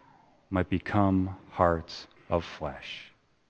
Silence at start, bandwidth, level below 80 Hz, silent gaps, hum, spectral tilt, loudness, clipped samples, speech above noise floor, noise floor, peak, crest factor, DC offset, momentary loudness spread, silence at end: 0.5 s; 7.6 kHz; -52 dBFS; none; none; -7.5 dB/octave; -30 LUFS; under 0.1%; 31 dB; -60 dBFS; -8 dBFS; 24 dB; under 0.1%; 15 LU; 0.45 s